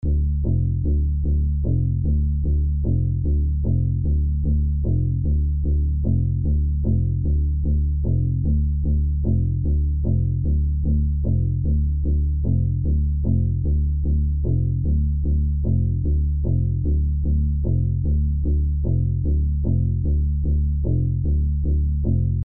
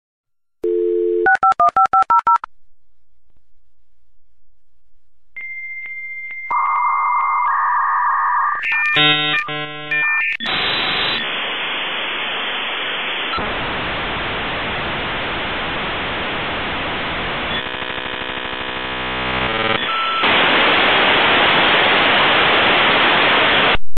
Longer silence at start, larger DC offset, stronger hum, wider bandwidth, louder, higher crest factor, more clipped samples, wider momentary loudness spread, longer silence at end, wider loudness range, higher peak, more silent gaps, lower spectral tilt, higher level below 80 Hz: second, 0 s vs 0.3 s; about the same, 2% vs 1%; neither; second, 0.9 kHz vs 14 kHz; second, -22 LUFS vs -16 LUFS; second, 10 dB vs 16 dB; neither; second, 1 LU vs 11 LU; about the same, 0 s vs 0 s; second, 0 LU vs 9 LU; second, -10 dBFS vs -2 dBFS; neither; first, -20 dB/octave vs -5 dB/octave; first, -22 dBFS vs -42 dBFS